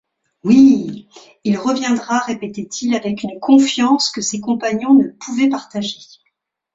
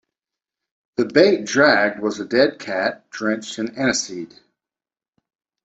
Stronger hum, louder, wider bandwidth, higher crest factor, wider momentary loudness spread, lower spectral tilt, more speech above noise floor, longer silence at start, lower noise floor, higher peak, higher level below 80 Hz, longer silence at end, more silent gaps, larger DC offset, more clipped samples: neither; first, -16 LUFS vs -19 LUFS; about the same, 7.8 kHz vs 8.2 kHz; second, 14 dB vs 20 dB; about the same, 14 LU vs 14 LU; about the same, -4 dB/octave vs -3.5 dB/octave; second, 54 dB vs over 71 dB; second, 0.45 s vs 1 s; second, -70 dBFS vs under -90 dBFS; about the same, -2 dBFS vs 0 dBFS; about the same, -60 dBFS vs -62 dBFS; second, 0.7 s vs 1.4 s; neither; neither; neither